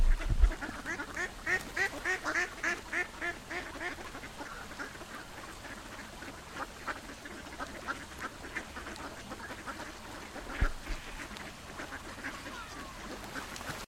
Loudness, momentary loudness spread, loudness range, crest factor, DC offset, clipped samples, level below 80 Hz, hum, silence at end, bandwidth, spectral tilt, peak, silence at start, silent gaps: -38 LUFS; 12 LU; 9 LU; 26 dB; under 0.1%; under 0.1%; -40 dBFS; none; 0 s; 16 kHz; -3.5 dB/octave; -12 dBFS; 0 s; none